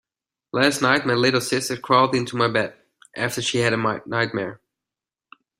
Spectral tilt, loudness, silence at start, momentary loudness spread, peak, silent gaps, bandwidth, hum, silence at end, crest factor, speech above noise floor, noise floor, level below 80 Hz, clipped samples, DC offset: -4 dB/octave; -21 LUFS; 0.55 s; 11 LU; -2 dBFS; none; 16 kHz; none; 1.05 s; 20 dB; 68 dB; -89 dBFS; -60 dBFS; under 0.1%; under 0.1%